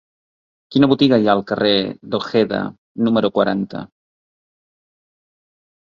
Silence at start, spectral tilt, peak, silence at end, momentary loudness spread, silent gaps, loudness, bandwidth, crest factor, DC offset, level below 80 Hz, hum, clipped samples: 0.7 s; -7.5 dB/octave; 0 dBFS; 2.1 s; 11 LU; 2.78-2.95 s; -17 LUFS; 7 kHz; 20 dB; under 0.1%; -56 dBFS; none; under 0.1%